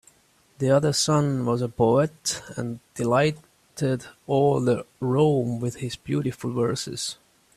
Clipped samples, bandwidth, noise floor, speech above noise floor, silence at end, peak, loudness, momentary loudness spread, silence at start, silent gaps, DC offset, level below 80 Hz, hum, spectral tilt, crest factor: under 0.1%; 14.5 kHz; -60 dBFS; 37 dB; 0.45 s; -6 dBFS; -24 LUFS; 11 LU; 0.6 s; none; under 0.1%; -58 dBFS; none; -5.5 dB/octave; 18 dB